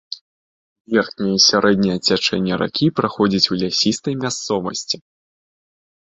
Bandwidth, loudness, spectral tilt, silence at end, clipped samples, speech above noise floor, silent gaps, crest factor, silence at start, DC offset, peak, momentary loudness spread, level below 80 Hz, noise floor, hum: 8.2 kHz; -18 LUFS; -4 dB/octave; 1.1 s; under 0.1%; over 72 dB; 0.21-0.85 s; 18 dB; 0.1 s; under 0.1%; -2 dBFS; 10 LU; -54 dBFS; under -90 dBFS; none